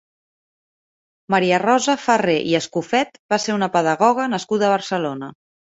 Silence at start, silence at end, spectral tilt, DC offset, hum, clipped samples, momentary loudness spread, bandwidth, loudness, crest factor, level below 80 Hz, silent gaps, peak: 1.3 s; 0.45 s; -4.5 dB/octave; under 0.1%; none; under 0.1%; 7 LU; 8.2 kHz; -19 LUFS; 18 dB; -64 dBFS; 3.19-3.29 s; -2 dBFS